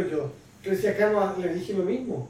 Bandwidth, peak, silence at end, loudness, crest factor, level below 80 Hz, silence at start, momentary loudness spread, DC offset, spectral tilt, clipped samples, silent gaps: 16 kHz; -10 dBFS; 0 s; -26 LUFS; 16 dB; -60 dBFS; 0 s; 10 LU; under 0.1%; -7 dB/octave; under 0.1%; none